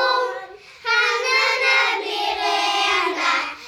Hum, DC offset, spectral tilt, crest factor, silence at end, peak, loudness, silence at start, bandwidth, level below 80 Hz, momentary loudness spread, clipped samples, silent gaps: none; under 0.1%; 0.5 dB/octave; 16 dB; 0 s; -6 dBFS; -19 LUFS; 0 s; 18.5 kHz; -62 dBFS; 7 LU; under 0.1%; none